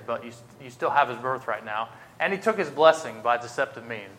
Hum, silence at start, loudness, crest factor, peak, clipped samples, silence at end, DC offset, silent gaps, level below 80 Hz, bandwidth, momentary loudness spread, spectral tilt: none; 0 s; -25 LUFS; 22 dB; -4 dBFS; under 0.1%; 0 s; under 0.1%; none; -72 dBFS; 15.5 kHz; 17 LU; -4 dB/octave